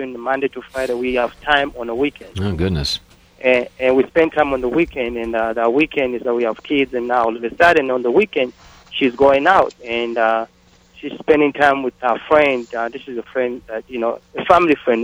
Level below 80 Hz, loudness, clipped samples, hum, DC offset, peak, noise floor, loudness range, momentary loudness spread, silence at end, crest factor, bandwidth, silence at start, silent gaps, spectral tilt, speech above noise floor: -42 dBFS; -18 LUFS; under 0.1%; none; under 0.1%; 0 dBFS; -47 dBFS; 3 LU; 11 LU; 0 s; 18 dB; 13.5 kHz; 0 s; none; -5.5 dB/octave; 30 dB